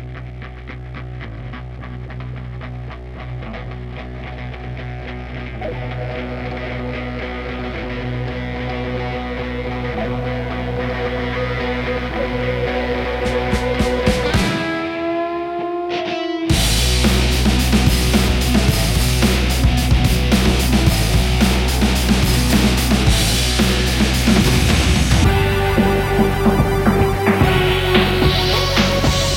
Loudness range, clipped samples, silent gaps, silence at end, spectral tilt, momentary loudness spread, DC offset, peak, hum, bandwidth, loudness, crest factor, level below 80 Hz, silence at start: 14 LU; under 0.1%; none; 0 s; -5 dB/octave; 15 LU; under 0.1%; 0 dBFS; none; 16.5 kHz; -17 LUFS; 16 dB; -22 dBFS; 0 s